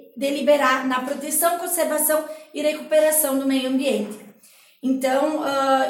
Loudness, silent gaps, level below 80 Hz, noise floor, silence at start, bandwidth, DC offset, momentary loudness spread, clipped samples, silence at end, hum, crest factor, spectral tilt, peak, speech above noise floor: -21 LUFS; none; -74 dBFS; -53 dBFS; 0.15 s; 17 kHz; under 0.1%; 8 LU; under 0.1%; 0 s; none; 16 dB; -2 dB/octave; -6 dBFS; 32 dB